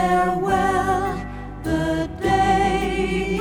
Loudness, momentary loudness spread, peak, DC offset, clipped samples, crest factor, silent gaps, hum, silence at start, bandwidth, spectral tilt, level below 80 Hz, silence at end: -21 LUFS; 9 LU; -8 dBFS; under 0.1%; under 0.1%; 12 dB; none; none; 0 s; 18 kHz; -6 dB/octave; -34 dBFS; 0 s